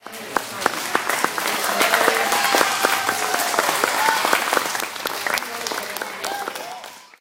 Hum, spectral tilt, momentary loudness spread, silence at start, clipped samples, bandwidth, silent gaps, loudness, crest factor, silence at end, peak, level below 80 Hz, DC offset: none; -0.5 dB/octave; 10 LU; 0.05 s; under 0.1%; 17 kHz; none; -20 LUFS; 22 dB; 0.15 s; 0 dBFS; -66 dBFS; under 0.1%